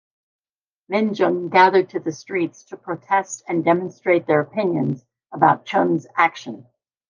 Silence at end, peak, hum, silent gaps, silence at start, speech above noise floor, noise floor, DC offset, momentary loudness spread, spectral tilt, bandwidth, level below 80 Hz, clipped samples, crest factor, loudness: 0.45 s; -2 dBFS; none; none; 0.9 s; over 70 dB; under -90 dBFS; under 0.1%; 16 LU; -6 dB/octave; 9.8 kHz; -74 dBFS; under 0.1%; 18 dB; -20 LUFS